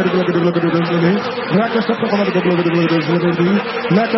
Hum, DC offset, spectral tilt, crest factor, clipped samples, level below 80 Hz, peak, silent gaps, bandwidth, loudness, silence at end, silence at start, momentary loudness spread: none; under 0.1%; -8.5 dB/octave; 14 dB; under 0.1%; -58 dBFS; -2 dBFS; none; 6 kHz; -16 LUFS; 0 s; 0 s; 2 LU